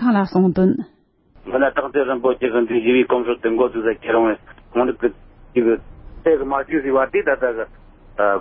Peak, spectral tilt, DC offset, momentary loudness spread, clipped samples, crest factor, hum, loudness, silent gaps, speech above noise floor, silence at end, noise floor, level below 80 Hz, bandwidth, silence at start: -4 dBFS; -12 dB/octave; under 0.1%; 8 LU; under 0.1%; 14 dB; none; -19 LUFS; none; 32 dB; 0 s; -50 dBFS; -46 dBFS; 5.8 kHz; 0 s